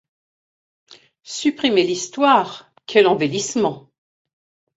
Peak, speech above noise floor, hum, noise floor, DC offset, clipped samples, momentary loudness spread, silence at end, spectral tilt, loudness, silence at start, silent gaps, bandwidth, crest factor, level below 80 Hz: 0 dBFS; over 72 dB; none; under -90 dBFS; under 0.1%; under 0.1%; 15 LU; 0.95 s; -3.5 dB/octave; -18 LUFS; 1.3 s; none; 8 kHz; 20 dB; -66 dBFS